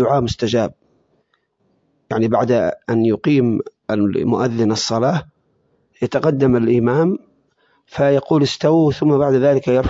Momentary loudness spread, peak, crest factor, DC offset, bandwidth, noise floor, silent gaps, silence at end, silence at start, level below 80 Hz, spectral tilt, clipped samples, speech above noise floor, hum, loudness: 8 LU; -2 dBFS; 16 dB; under 0.1%; 7.8 kHz; -65 dBFS; none; 0 s; 0 s; -44 dBFS; -6.5 dB/octave; under 0.1%; 49 dB; none; -17 LUFS